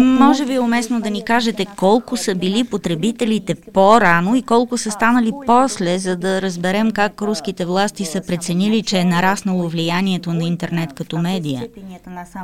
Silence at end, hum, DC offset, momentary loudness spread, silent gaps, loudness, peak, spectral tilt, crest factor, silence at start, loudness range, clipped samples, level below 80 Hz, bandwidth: 0 s; none; 0.8%; 9 LU; none; -17 LUFS; 0 dBFS; -5 dB/octave; 16 dB; 0 s; 4 LU; under 0.1%; -50 dBFS; 16 kHz